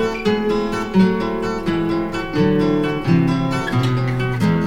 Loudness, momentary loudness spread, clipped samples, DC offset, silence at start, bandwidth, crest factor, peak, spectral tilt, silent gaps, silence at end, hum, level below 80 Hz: -19 LUFS; 5 LU; under 0.1%; under 0.1%; 0 s; 16 kHz; 14 dB; -4 dBFS; -7.5 dB/octave; none; 0 s; none; -36 dBFS